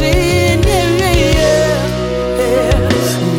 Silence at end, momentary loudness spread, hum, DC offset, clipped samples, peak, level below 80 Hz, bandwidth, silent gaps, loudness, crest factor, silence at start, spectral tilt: 0 s; 5 LU; none; under 0.1%; under 0.1%; 0 dBFS; -20 dBFS; 17 kHz; none; -13 LUFS; 12 dB; 0 s; -5 dB/octave